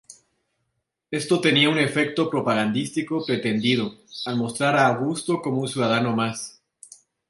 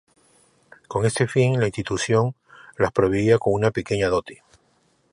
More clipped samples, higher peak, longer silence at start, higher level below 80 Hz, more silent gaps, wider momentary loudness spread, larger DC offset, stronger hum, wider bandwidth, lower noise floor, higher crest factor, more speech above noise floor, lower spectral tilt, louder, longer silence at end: neither; about the same, -4 dBFS vs -4 dBFS; second, 0.1 s vs 0.9 s; second, -66 dBFS vs -48 dBFS; neither; first, 10 LU vs 7 LU; neither; neither; about the same, 11.5 kHz vs 11.5 kHz; first, -77 dBFS vs -64 dBFS; about the same, 20 dB vs 18 dB; first, 55 dB vs 43 dB; about the same, -5 dB/octave vs -6 dB/octave; about the same, -22 LUFS vs -22 LUFS; about the same, 0.8 s vs 0.8 s